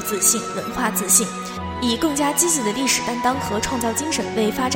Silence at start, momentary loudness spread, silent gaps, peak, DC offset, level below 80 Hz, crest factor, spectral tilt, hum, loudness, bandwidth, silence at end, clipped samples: 0 s; 8 LU; none; -2 dBFS; under 0.1%; -46 dBFS; 18 dB; -2.5 dB/octave; none; -20 LUFS; 17 kHz; 0 s; under 0.1%